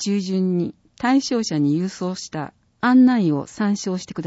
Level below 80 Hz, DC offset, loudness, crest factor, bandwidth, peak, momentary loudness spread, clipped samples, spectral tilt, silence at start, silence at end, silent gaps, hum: -62 dBFS; under 0.1%; -20 LUFS; 14 dB; 8 kHz; -6 dBFS; 14 LU; under 0.1%; -5.5 dB/octave; 0 s; 0 s; none; none